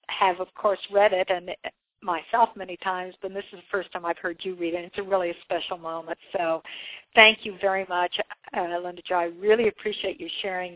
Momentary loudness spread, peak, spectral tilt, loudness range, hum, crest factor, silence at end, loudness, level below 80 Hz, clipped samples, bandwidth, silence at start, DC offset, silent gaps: 13 LU; 0 dBFS; -6.5 dB/octave; 8 LU; none; 26 dB; 0 s; -25 LUFS; -66 dBFS; under 0.1%; 4 kHz; 0.1 s; under 0.1%; none